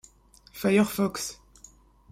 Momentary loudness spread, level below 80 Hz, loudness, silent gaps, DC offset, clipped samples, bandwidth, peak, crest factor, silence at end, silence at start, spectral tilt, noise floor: 23 LU; -58 dBFS; -26 LUFS; none; under 0.1%; under 0.1%; 16 kHz; -10 dBFS; 20 dB; 0.8 s; 0.55 s; -5 dB/octave; -57 dBFS